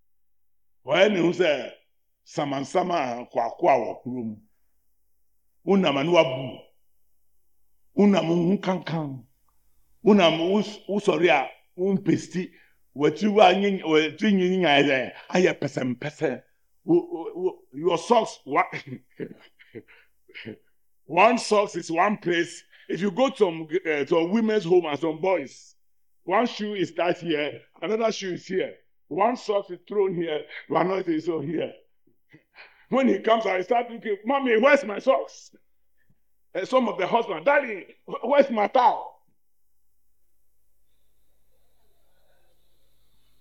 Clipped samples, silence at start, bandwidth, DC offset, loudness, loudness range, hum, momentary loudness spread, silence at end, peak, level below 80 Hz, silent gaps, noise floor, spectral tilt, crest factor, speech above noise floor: under 0.1%; 0.85 s; 10.5 kHz; under 0.1%; -24 LUFS; 5 LU; none; 15 LU; 4.3 s; -4 dBFS; -72 dBFS; none; -80 dBFS; -5.5 dB/octave; 22 dB; 57 dB